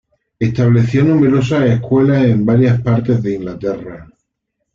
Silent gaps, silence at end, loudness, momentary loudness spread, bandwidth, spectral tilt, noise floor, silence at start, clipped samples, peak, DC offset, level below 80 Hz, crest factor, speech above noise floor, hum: none; 0.7 s; -14 LUFS; 10 LU; 7.2 kHz; -9 dB/octave; -73 dBFS; 0.4 s; under 0.1%; -2 dBFS; under 0.1%; -44 dBFS; 12 dB; 60 dB; none